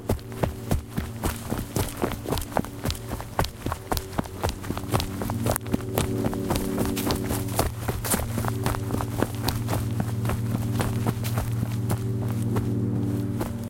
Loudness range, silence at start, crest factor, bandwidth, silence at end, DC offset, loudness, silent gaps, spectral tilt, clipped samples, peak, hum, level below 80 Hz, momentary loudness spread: 3 LU; 0 s; 26 dB; 17 kHz; 0 s; under 0.1%; -28 LUFS; none; -5.5 dB/octave; under 0.1%; -2 dBFS; none; -38 dBFS; 5 LU